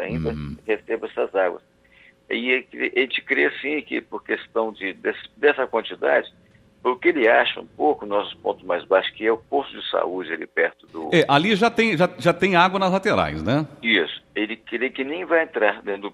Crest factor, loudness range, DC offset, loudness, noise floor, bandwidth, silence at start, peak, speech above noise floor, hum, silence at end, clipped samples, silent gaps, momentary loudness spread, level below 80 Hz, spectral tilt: 20 dB; 5 LU; under 0.1%; -22 LUFS; -54 dBFS; 12.5 kHz; 0 s; -2 dBFS; 32 dB; none; 0 s; under 0.1%; none; 10 LU; -54 dBFS; -5.5 dB/octave